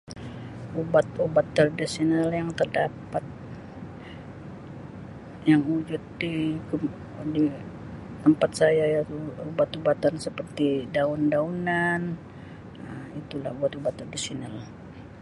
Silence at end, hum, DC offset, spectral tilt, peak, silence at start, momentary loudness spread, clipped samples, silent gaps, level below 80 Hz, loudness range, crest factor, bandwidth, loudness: 0 s; none; under 0.1%; -6 dB/octave; -8 dBFS; 0.05 s; 19 LU; under 0.1%; none; -54 dBFS; 5 LU; 20 dB; 11.5 kHz; -26 LUFS